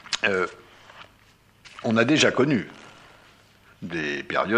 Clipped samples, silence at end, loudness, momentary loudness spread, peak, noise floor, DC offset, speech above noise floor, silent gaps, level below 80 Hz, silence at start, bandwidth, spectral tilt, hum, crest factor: under 0.1%; 0 s; -23 LUFS; 22 LU; -6 dBFS; -57 dBFS; under 0.1%; 35 dB; none; -62 dBFS; 0.1 s; 11 kHz; -4.5 dB/octave; none; 20 dB